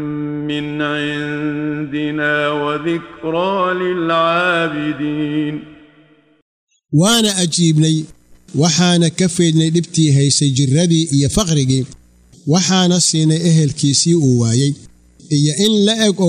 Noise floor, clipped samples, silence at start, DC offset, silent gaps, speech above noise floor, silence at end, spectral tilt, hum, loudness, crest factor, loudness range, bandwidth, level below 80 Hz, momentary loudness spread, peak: -50 dBFS; under 0.1%; 0 s; under 0.1%; 6.42-6.67 s; 36 dB; 0 s; -4.5 dB/octave; none; -15 LUFS; 14 dB; 5 LU; 15 kHz; -44 dBFS; 9 LU; -2 dBFS